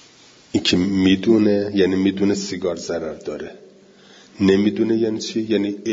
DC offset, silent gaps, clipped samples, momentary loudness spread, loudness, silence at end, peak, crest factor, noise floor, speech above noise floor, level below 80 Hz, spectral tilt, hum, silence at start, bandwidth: under 0.1%; none; under 0.1%; 11 LU; -19 LUFS; 0 s; -4 dBFS; 16 dB; -49 dBFS; 30 dB; -56 dBFS; -5.5 dB/octave; none; 0.55 s; 7.8 kHz